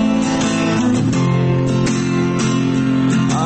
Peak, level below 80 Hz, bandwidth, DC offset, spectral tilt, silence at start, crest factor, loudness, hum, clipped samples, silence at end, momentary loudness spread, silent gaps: -6 dBFS; -40 dBFS; 8.8 kHz; under 0.1%; -6 dB/octave; 0 s; 10 dB; -16 LUFS; none; under 0.1%; 0 s; 1 LU; none